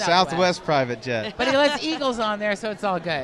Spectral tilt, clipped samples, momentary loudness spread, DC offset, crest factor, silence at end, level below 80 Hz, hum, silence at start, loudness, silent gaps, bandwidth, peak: -4 dB/octave; under 0.1%; 7 LU; under 0.1%; 18 dB; 0 s; -54 dBFS; none; 0 s; -22 LUFS; none; 11.5 kHz; -4 dBFS